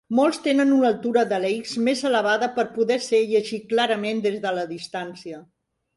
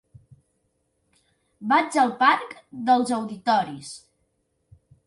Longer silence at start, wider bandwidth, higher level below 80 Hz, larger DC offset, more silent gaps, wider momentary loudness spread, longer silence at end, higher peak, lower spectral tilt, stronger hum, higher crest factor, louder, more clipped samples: second, 0.1 s vs 1.6 s; about the same, 11.5 kHz vs 11.5 kHz; about the same, -70 dBFS vs -68 dBFS; neither; neither; second, 12 LU vs 19 LU; second, 0.55 s vs 1.1 s; about the same, -6 dBFS vs -6 dBFS; about the same, -4.5 dB/octave vs -4 dB/octave; neither; about the same, 16 dB vs 20 dB; about the same, -22 LUFS vs -22 LUFS; neither